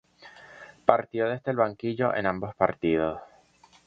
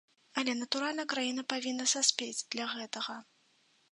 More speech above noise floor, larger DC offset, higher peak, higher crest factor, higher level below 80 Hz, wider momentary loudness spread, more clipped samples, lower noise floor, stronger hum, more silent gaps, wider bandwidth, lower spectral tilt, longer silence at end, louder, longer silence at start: about the same, 32 dB vs 35 dB; neither; first, 0 dBFS vs -10 dBFS; about the same, 28 dB vs 26 dB; first, -58 dBFS vs -88 dBFS; first, 18 LU vs 11 LU; neither; second, -59 dBFS vs -70 dBFS; neither; neither; second, 7.4 kHz vs 11 kHz; first, -8 dB/octave vs 0 dB/octave; about the same, 0.65 s vs 0.7 s; first, -27 LUFS vs -33 LUFS; about the same, 0.25 s vs 0.35 s